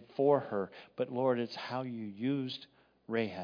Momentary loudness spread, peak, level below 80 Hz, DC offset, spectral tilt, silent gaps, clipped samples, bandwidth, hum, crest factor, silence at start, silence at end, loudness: 12 LU; -16 dBFS; -82 dBFS; under 0.1%; -5 dB/octave; none; under 0.1%; 5.2 kHz; none; 20 dB; 0 s; 0 s; -35 LUFS